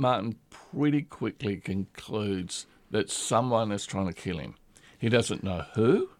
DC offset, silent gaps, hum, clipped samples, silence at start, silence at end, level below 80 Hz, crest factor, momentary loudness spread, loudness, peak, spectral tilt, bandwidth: under 0.1%; none; none; under 0.1%; 0 s; 0.1 s; -58 dBFS; 18 dB; 11 LU; -29 LUFS; -12 dBFS; -5.5 dB/octave; 15 kHz